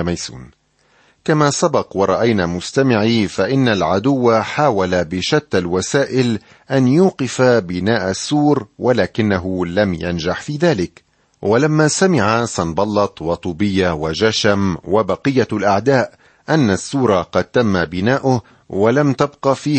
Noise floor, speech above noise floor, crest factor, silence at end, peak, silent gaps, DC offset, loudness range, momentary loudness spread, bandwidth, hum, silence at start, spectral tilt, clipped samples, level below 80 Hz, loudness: -56 dBFS; 40 dB; 14 dB; 0 s; -2 dBFS; none; under 0.1%; 2 LU; 6 LU; 8.8 kHz; none; 0 s; -5.5 dB/octave; under 0.1%; -46 dBFS; -16 LUFS